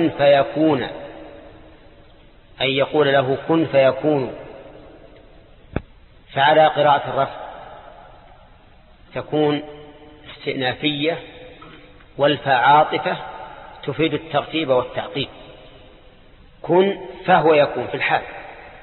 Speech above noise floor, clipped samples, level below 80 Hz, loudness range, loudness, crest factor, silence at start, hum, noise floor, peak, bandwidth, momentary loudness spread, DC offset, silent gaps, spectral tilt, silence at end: 30 dB; under 0.1%; -50 dBFS; 5 LU; -19 LUFS; 18 dB; 0 s; none; -48 dBFS; -2 dBFS; 4.3 kHz; 23 LU; under 0.1%; none; -10.5 dB/octave; 0.05 s